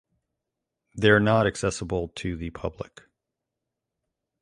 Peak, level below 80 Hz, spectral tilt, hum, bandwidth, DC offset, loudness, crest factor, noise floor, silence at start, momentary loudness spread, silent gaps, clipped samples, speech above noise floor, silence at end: -4 dBFS; -48 dBFS; -5.5 dB/octave; none; 11.5 kHz; under 0.1%; -25 LUFS; 24 dB; -85 dBFS; 0.95 s; 20 LU; none; under 0.1%; 60 dB; 1.6 s